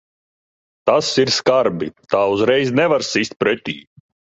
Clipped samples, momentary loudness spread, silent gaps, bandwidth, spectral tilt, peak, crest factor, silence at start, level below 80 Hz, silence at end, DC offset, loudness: under 0.1%; 8 LU; 3.36-3.40 s; 8.2 kHz; -4 dB/octave; -2 dBFS; 16 dB; 0.85 s; -56 dBFS; 0.55 s; under 0.1%; -17 LUFS